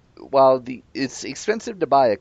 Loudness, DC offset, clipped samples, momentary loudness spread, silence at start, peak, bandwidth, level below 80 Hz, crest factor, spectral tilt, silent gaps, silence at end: -21 LUFS; under 0.1%; under 0.1%; 12 LU; 0.2 s; -4 dBFS; 8.2 kHz; -62 dBFS; 16 dB; -4.5 dB/octave; none; 0.05 s